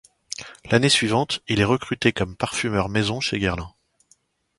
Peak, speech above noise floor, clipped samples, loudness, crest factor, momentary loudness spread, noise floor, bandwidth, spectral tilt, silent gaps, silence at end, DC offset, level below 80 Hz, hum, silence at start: -4 dBFS; 40 dB; under 0.1%; -22 LUFS; 20 dB; 17 LU; -62 dBFS; 11.5 kHz; -4.5 dB/octave; none; 0.9 s; under 0.1%; -46 dBFS; none; 0.3 s